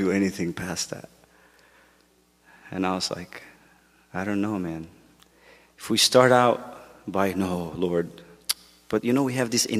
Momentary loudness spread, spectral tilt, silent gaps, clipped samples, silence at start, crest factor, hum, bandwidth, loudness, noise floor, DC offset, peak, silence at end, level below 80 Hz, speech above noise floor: 20 LU; -4 dB/octave; none; under 0.1%; 0 s; 24 dB; none; 15.5 kHz; -24 LUFS; -62 dBFS; under 0.1%; -4 dBFS; 0 s; -60 dBFS; 38 dB